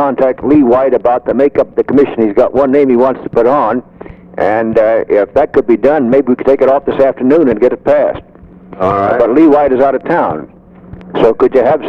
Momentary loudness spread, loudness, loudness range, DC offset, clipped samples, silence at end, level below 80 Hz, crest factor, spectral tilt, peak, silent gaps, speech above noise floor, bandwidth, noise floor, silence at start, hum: 6 LU; -10 LUFS; 1 LU; under 0.1%; under 0.1%; 0 s; -42 dBFS; 10 dB; -9 dB/octave; 0 dBFS; none; 24 dB; 6.2 kHz; -34 dBFS; 0 s; none